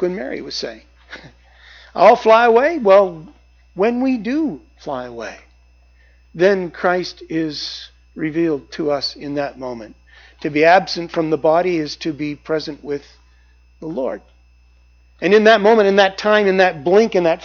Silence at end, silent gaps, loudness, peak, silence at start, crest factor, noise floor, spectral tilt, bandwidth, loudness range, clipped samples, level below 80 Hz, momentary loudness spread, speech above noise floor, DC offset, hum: 0 s; none; -16 LUFS; 0 dBFS; 0 s; 18 dB; -51 dBFS; -5.5 dB/octave; 7 kHz; 8 LU; under 0.1%; -50 dBFS; 19 LU; 34 dB; under 0.1%; 60 Hz at -45 dBFS